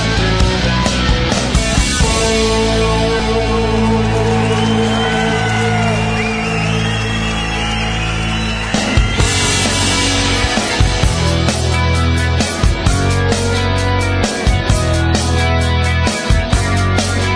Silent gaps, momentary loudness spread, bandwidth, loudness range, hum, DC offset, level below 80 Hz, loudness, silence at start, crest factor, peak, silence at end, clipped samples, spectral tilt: none; 3 LU; 11 kHz; 2 LU; none; under 0.1%; -20 dBFS; -14 LUFS; 0 s; 14 dB; 0 dBFS; 0 s; under 0.1%; -4.5 dB/octave